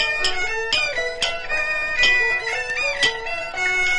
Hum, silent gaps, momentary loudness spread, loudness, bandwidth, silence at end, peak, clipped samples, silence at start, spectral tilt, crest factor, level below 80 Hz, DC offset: none; none; 7 LU; -20 LUFS; 11.5 kHz; 0 s; -6 dBFS; under 0.1%; 0 s; -0.5 dB/octave; 16 dB; -40 dBFS; under 0.1%